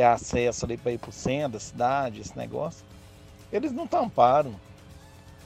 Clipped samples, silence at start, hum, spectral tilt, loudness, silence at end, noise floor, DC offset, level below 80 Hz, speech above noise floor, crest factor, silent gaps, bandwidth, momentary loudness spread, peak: under 0.1%; 0 s; none; -5.5 dB/octave; -27 LUFS; 0.05 s; -49 dBFS; under 0.1%; -50 dBFS; 23 dB; 20 dB; none; 14 kHz; 14 LU; -6 dBFS